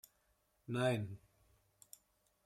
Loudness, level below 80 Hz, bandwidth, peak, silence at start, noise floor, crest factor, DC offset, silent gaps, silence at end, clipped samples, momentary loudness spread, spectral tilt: -39 LUFS; -78 dBFS; 15.5 kHz; -22 dBFS; 0.7 s; -78 dBFS; 22 dB; under 0.1%; none; 1.3 s; under 0.1%; 24 LU; -6 dB/octave